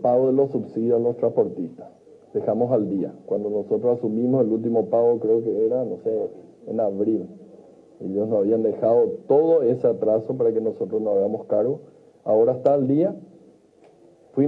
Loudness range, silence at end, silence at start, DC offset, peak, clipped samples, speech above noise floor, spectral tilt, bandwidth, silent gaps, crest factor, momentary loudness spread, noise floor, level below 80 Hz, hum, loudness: 3 LU; 0 s; 0 s; under 0.1%; -6 dBFS; under 0.1%; 33 dB; -11.5 dB/octave; 3.9 kHz; none; 16 dB; 10 LU; -54 dBFS; -74 dBFS; none; -22 LUFS